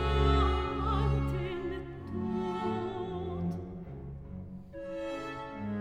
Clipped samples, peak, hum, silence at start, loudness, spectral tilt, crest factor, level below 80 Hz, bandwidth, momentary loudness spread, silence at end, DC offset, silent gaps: under 0.1%; -14 dBFS; none; 0 s; -34 LUFS; -8 dB/octave; 18 dB; -38 dBFS; 8.4 kHz; 16 LU; 0 s; under 0.1%; none